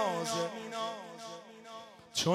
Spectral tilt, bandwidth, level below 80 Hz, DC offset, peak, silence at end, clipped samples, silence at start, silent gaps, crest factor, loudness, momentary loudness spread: -3.5 dB/octave; 16 kHz; -76 dBFS; under 0.1%; -16 dBFS; 0 s; under 0.1%; 0 s; none; 20 dB; -37 LUFS; 16 LU